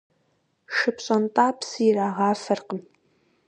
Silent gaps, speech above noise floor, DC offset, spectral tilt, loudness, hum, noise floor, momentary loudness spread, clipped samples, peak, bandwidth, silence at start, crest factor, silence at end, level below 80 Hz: none; 46 dB; under 0.1%; -5 dB/octave; -23 LUFS; none; -69 dBFS; 7 LU; under 0.1%; -4 dBFS; 9.6 kHz; 0.7 s; 20 dB; 0.65 s; -76 dBFS